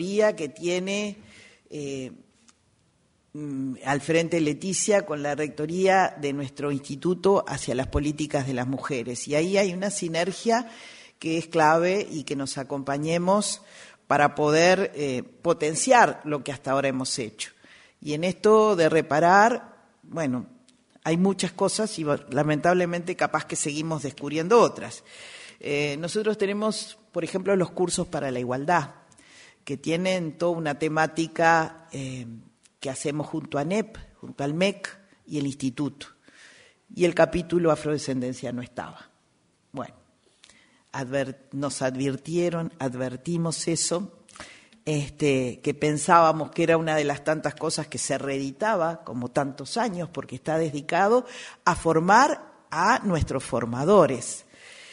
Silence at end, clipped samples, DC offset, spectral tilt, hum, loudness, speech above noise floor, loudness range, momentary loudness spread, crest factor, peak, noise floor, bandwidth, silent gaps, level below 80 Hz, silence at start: 0 s; under 0.1%; under 0.1%; -4.5 dB/octave; none; -25 LUFS; 42 dB; 7 LU; 17 LU; 22 dB; -4 dBFS; -66 dBFS; 11 kHz; none; -52 dBFS; 0 s